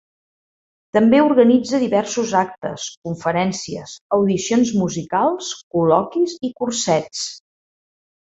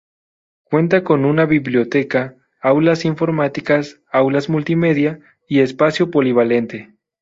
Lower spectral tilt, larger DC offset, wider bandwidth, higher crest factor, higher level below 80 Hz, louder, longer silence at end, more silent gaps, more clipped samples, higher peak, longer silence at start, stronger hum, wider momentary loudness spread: second, -5 dB/octave vs -7.5 dB/octave; neither; about the same, 8.2 kHz vs 7.8 kHz; about the same, 18 dB vs 14 dB; about the same, -58 dBFS vs -58 dBFS; second, -19 LUFS vs -16 LUFS; first, 1 s vs 0.4 s; first, 2.97-3.02 s, 4.01-4.09 s, 5.63-5.71 s vs none; neither; about the same, -2 dBFS vs -2 dBFS; first, 0.95 s vs 0.7 s; neither; first, 14 LU vs 7 LU